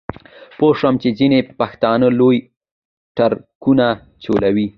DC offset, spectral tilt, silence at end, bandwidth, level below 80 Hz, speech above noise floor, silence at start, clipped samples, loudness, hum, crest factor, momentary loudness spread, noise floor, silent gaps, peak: under 0.1%; -9 dB/octave; 0.05 s; 5.8 kHz; -48 dBFS; 23 dB; 0.6 s; under 0.1%; -16 LUFS; none; 16 dB; 8 LU; -38 dBFS; 2.56-2.60 s, 2.71-3.15 s, 3.55-3.61 s; 0 dBFS